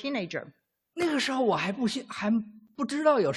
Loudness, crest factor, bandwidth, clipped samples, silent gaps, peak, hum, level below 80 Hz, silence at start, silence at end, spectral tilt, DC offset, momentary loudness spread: -29 LUFS; 18 dB; 12.5 kHz; under 0.1%; none; -10 dBFS; none; -72 dBFS; 0 s; 0 s; -5 dB/octave; under 0.1%; 12 LU